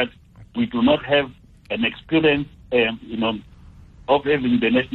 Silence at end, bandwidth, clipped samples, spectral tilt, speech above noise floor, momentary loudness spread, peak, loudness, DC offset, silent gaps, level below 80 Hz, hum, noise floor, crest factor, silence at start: 0 s; 4.3 kHz; under 0.1%; -8 dB/octave; 25 dB; 12 LU; -6 dBFS; -21 LUFS; under 0.1%; none; -48 dBFS; none; -45 dBFS; 16 dB; 0 s